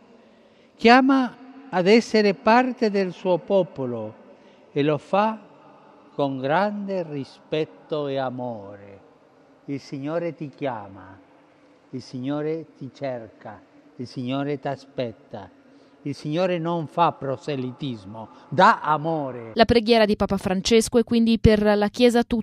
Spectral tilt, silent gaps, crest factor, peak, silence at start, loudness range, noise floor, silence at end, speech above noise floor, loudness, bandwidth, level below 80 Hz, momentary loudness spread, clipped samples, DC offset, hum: -5.5 dB/octave; none; 22 dB; -2 dBFS; 0.8 s; 13 LU; -55 dBFS; 0 s; 33 dB; -22 LUFS; 13 kHz; -46 dBFS; 19 LU; under 0.1%; under 0.1%; none